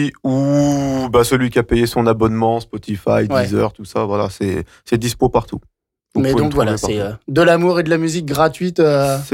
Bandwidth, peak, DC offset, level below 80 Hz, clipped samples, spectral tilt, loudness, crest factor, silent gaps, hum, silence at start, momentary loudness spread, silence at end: 17 kHz; -4 dBFS; under 0.1%; -38 dBFS; under 0.1%; -6 dB/octave; -16 LUFS; 12 dB; none; none; 0 s; 8 LU; 0 s